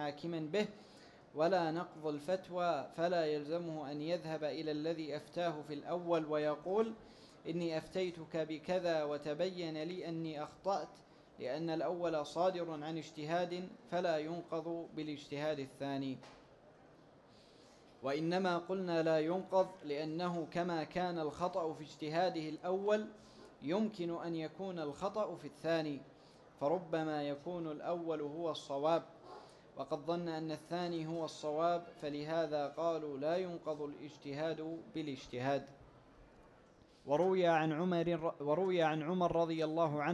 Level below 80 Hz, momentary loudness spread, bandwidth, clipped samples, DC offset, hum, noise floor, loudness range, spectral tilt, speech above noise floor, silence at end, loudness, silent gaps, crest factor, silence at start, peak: -74 dBFS; 9 LU; 12 kHz; under 0.1%; under 0.1%; none; -64 dBFS; 4 LU; -6.5 dB/octave; 26 dB; 0 s; -38 LUFS; none; 18 dB; 0 s; -20 dBFS